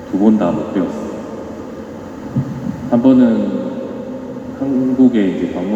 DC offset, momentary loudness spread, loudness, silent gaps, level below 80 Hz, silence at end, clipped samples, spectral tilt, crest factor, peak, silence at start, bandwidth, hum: under 0.1%; 17 LU; -16 LUFS; none; -48 dBFS; 0 s; under 0.1%; -8.5 dB/octave; 16 dB; 0 dBFS; 0 s; 7.8 kHz; none